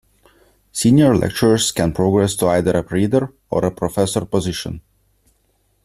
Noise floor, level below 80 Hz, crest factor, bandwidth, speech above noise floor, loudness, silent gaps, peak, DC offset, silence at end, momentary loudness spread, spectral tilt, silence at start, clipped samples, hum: -63 dBFS; -44 dBFS; 16 dB; 14.5 kHz; 46 dB; -17 LUFS; none; -2 dBFS; under 0.1%; 1.05 s; 11 LU; -5.5 dB/octave; 0.75 s; under 0.1%; none